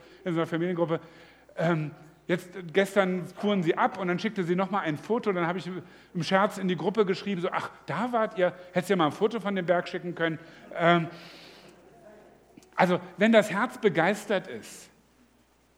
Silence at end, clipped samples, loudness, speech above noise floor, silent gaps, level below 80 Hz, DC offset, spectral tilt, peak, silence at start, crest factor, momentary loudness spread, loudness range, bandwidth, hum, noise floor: 0.95 s; under 0.1%; -27 LUFS; 36 dB; none; -72 dBFS; under 0.1%; -6 dB/octave; -6 dBFS; 0.25 s; 22 dB; 14 LU; 2 LU; 15.5 kHz; none; -64 dBFS